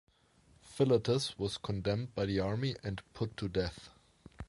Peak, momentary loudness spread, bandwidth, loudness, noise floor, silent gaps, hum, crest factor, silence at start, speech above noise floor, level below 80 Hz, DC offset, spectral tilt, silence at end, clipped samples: -18 dBFS; 11 LU; 11.5 kHz; -35 LUFS; -66 dBFS; none; none; 18 dB; 0.65 s; 32 dB; -54 dBFS; under 0.1%; -6 dB/octave; 0.05 s; under 0.1%